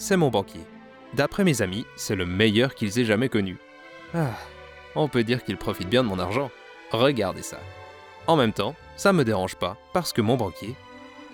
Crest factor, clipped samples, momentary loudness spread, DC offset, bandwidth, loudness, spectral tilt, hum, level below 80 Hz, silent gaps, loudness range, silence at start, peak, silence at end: 20 dB; under 0.1%; 21 LU; under 0.1%; over 20 kHz; -25 LUFS; -5.5 dB/octave; none; -54 dBFS; none; 3 LU; 0 s; -6 dBFS; 0 s